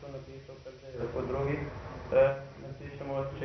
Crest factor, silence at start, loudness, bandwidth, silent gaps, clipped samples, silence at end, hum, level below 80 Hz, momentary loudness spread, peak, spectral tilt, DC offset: 20 dB; 0 s; -32 LUFS; 6.2 kHz; none; under 0.1%; 0 s; none; -52 dBFS; 21 LU; -14 dBFS; -6.5 dB/octave; under 0.1%